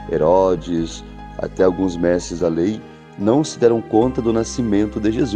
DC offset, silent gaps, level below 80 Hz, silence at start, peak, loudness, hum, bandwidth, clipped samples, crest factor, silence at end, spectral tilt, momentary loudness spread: under 0.1%; none; -38 dBFS; 0 s; -2 dBFS; -18 LUFS; none; 9.8 kHz; under 0.1%; 16 dB; 0 s; -6.5 dB/octave; 13 LU